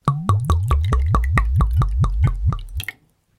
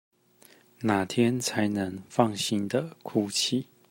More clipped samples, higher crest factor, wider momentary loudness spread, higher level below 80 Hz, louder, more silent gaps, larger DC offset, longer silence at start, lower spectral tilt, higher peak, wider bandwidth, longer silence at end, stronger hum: neither; second, 16 dB vs 22 dB; first, 9 LU vs 6 LU; first, -22 dBFS vs -70 dBFS; first, -20 LUFS vs -28 LUFS; neither; neither; second, 0.05 s vs 0.8 s; first, -7 dB/octave vs -4.5 dB/octave; first, -2 dBFS vs -6 dBFS; about the same, 15 kHz vs 16 kHz; first, 0.45 s vs 0.25 s; neither